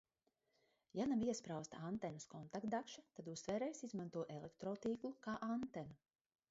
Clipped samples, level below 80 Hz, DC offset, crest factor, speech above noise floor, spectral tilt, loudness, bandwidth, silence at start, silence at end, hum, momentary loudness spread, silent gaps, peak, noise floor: under 0.1%; -78 dBFS; under 0.1%; 16 dB; 41 dB; -6 dB/octave; -46 LUFS; 7.6 kHz; 0.95 s; 0.55 s; none; 11 LU; none; -30 dBFS; -86 dBFS